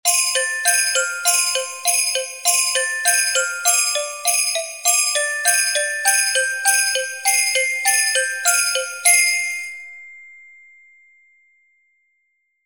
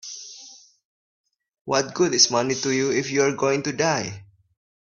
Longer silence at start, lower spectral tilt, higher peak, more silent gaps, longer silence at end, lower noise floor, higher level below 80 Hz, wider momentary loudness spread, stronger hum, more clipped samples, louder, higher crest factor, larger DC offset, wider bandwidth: about the same, 0.05 s vs 0.05 s; second, 5.5 dB/octave vs -3 dB/octave; about the same, -2 dBFS vs -2 dBFS; second, none vs 0.85-1.24 s, 1.61-1.65 s; first, 2.25 s vs 0.6 s; first, -69 dBFS vs -47 dBFS; second, -74 dBFS vs -66 dBFS; second, 5 LU vs 21 LU; neither; neither; first, -16 LUFS vs -21 LUFS; about the same, 20 dB vs 22 dB; neither; first, 17 kHz vs 7.4 kHz